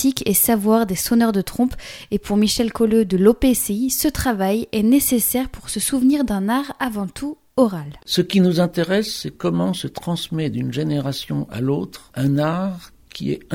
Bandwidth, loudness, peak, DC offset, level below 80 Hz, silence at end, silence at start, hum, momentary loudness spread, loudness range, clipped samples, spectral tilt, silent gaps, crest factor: 17.5 kHz; -19 LUFS; 0 dBFS; under 0.1%; -42 dBFS; 0 s; 0 s; none; 11 LU; 5 LU; under 0.1%; -5 dB/octave; none; 20 dB